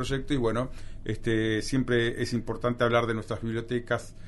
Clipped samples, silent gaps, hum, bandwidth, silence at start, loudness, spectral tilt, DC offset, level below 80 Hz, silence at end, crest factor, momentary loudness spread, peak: under 0.1%; none; none; 11.5 kHz; 0 s; -29 LUFS; -6 dB/octave; under 0.1%; -42 dBFS; 0 s; 18 dB; 8 LU; -10 dBFS